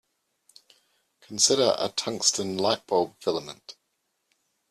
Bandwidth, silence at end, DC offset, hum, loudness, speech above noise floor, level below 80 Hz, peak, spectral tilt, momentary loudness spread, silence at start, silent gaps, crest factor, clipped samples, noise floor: 14 kHz; 1 s; under 0.1%; none; -24 LUFS; 51 dB; -70 dBFS; -4 dBFS; -2 dB/octave; 15 LU; 1.3 s; none; 24 dB; under 0.1%; -77 dBFS